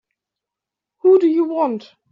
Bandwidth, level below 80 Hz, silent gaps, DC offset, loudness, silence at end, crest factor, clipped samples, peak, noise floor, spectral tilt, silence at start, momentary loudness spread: 5.6 kHz; -70 dBFS; none; under 0.1%; -17 LUFS; 0.35 s; 14 dB; under 0.1%; -4 dBFS; -85 dBFS; -6 dB/octave; 1.05 s; 9 LU